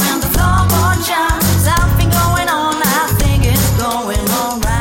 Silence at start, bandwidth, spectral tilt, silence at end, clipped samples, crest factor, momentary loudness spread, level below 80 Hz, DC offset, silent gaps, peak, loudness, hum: 0 s; 17 kHz; -4.5 dB/octave; 0 s; under 0.1%; 10 dB; 4 LU; -20 dBFS; under 0.1%; none; -2 dBFS; -13 LUFS; none